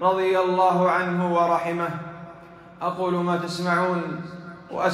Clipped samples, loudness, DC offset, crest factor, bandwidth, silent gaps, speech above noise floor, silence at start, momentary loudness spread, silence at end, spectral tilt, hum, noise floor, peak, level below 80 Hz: under 0.1%; -23 LUFS; under 0.1%; 16 dB; 13 kHz; none; 22 dB; 0 s; 17 LU; 0 s; -6.5 dB/octave; none; -45 dBFS; -8 dBFS; -64 dBFS